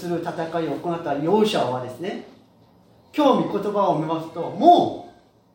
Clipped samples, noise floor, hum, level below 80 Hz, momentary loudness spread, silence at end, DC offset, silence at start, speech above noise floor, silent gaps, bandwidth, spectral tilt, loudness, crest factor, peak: under 0.1%; -54 dBFS; none; -66 dBFS; 15 LU; 0.45 s; under 0.1%; 0 s; 33 dB; none; 16.5 kHz; -6.5 dB/octave; -22 LUFS; 20 dB; -2 dBFS